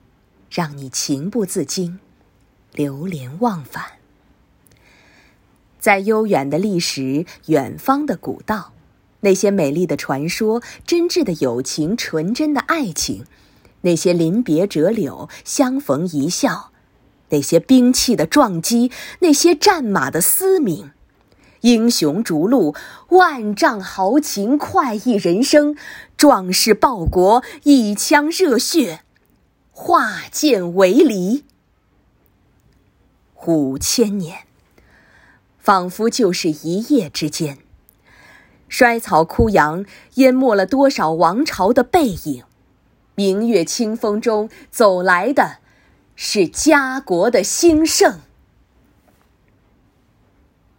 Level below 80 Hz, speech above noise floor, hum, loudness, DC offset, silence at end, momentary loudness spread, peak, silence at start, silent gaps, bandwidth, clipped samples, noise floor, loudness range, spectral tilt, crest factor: -44 dBFS; 43 dB; none; -16 LUFS; under 0.1%; 2.6 s; 12 LU; 0 dBFS; 0.5 s; none; 17 kHz; under 0.1%; -59 dBFS; 7 LU; -4 dB/octave; 18 dB